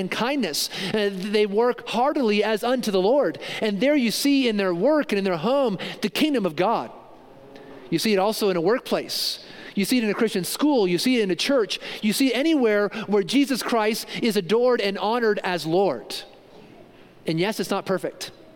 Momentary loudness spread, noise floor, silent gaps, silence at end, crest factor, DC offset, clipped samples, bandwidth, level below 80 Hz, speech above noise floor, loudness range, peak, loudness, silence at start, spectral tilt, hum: 7 LU; -48 dBFS; none; 0.25 s; 16 dB; under 0.1%; under 0.1%; 17 kHz; -62 dBFS; 26 dB; 3 LU; -8 dBFS; -23 LUFS; 0 s; -4.5 dB/octave; none